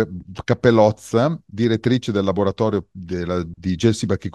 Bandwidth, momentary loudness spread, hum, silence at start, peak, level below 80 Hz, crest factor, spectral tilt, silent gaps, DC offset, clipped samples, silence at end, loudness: 12.5 kHz; 10 LU; none; 0 s; 0 dBFS; -50 dBFS; 18 dB; -6.5 dB/octave; none; under 0.1%; under 0.1%; 0.05 s; -20 LUFS